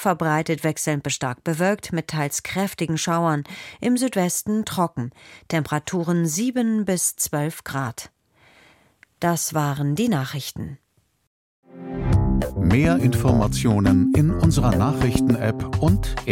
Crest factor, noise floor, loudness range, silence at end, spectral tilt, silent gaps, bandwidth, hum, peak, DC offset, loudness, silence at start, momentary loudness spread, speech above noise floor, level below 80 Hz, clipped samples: 18 dB; -57 dBFS; 7 LU; 0 s; -5.5 dB/octave; 11.27-11.63 s; 17 kHz; none; -4 dBFS; under 0.1%; -22 LUFS; 0 s; 10 LU; 35 dB; -36 dBFS; under 0.1%